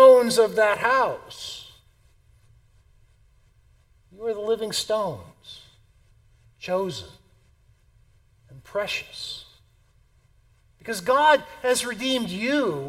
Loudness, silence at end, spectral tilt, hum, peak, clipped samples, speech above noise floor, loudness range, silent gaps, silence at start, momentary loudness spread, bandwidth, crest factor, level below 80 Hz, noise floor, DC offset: -23 LUFS; 0 s; -3 dB/octave; none; -4 dBFS; under 0.1%; 36 dB; 11 LU; none; 0 s; 21 LU; 16 kHz; 22 dB; -60 dBFS; -60 dBFS; under 0.1%